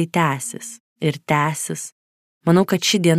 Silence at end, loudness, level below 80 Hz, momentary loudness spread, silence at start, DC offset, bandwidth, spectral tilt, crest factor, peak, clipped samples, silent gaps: 0 s; -20 LUFS; -64 dBFS; 15 LU; 0 s; under 0.1%; 15.5 kHz; -4.5 dB/octave; 18 dB; -2 dBFS; under 0.1%; 0.80-0.96 s, 1.92-2.41 s